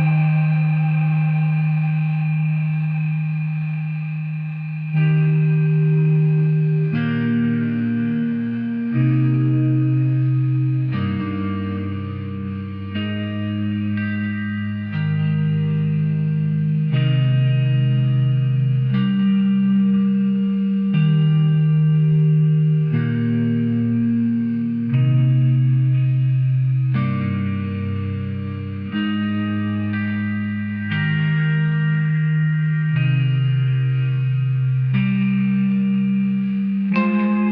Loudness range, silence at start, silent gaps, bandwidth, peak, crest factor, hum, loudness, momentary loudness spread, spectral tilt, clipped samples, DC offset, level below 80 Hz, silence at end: 6 LU; 0 s; none; 4.3 kHz; -6 dBFS; 12 dB; none; -19 LUFS; 8 LU; -11.5 dB/octave; under 0.1%; under 0.1%; -58 dBFS; 0 s